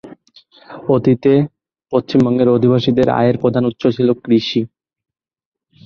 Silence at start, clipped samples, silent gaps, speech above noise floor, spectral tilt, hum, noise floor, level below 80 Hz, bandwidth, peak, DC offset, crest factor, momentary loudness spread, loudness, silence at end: 0.05 s; under 0.1%; none; 35 dB; -8.5 dB/octave; none; -48 dBFS; -50 dBFS; 6.8 kHz; -2 dBFS; under 0.1%; 14 dB; 7 LU; -15 LUFS; 1.2 s